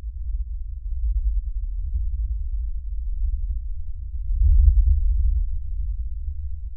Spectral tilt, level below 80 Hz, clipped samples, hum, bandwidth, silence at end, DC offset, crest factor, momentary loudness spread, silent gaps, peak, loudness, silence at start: -25 dB/octave; -22 dBFS; under 0.1%; none; 0.2 kHz; 0 s; under 0.1%; 18 dB; 14 LU; none; -4 dBFS; -27 LUFS; 0 s